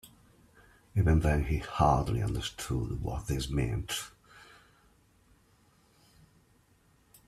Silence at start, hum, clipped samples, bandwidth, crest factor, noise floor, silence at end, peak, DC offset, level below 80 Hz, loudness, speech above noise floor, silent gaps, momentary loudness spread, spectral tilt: 0.05 s; none; under 0.1%; 14.5 kHz; 20 dB; -66 dBFS; 2.9 s; -12 dBFS; under 0.1%; -42 dBFS; -31 LUFS; 37 dB; none; 10 LU; -6 dB/octave